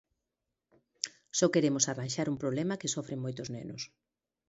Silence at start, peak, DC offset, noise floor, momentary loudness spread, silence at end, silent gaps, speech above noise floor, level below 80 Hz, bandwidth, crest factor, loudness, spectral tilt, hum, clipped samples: 1.05 s; -8 dBFS; under 0.1%; -87 dBFS; 13 LU; 0.65 s; none; 55 dB; -72 dBFS; 8.2 kHz; 26 dB; -32 LUFS; -4 dB/octave; none; under 0.1%